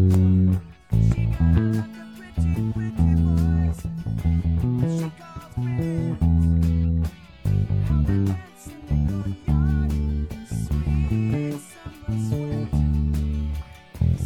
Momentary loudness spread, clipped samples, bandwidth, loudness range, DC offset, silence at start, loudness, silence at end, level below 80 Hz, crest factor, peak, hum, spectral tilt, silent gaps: 11 LU; under 0.1%; 12 kHz; 3 LU; under 0.1%; 0 s; -23 LUFS; 0 s; -30 dBFS; 16 dB; -6 dBFS; none; -8.5 dB/octave; none